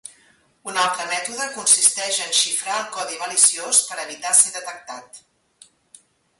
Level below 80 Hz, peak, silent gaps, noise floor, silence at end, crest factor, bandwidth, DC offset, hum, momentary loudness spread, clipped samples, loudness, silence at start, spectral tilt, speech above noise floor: -74 dBFS; 0 dBFS; none; -58 dBFS; 1.2 s; 22 dB; 12 kHz; under 0.1%; none; 18 LU; under 0.1%; -18 LUFS; 0.05 s; 2 dB/octave; 36 dB